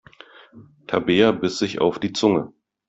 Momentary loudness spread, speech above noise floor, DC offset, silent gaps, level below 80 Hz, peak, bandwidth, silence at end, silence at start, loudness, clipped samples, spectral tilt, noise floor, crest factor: 8 LU; 28 dB; under 0.1%; none; -60 dBFS; -2 dBFS; 8.2 kHz; 0.4 s; 0.55 s; -21 LUFS; under 0.1%; -5 dB/octave; -48 dBFS; 20 dB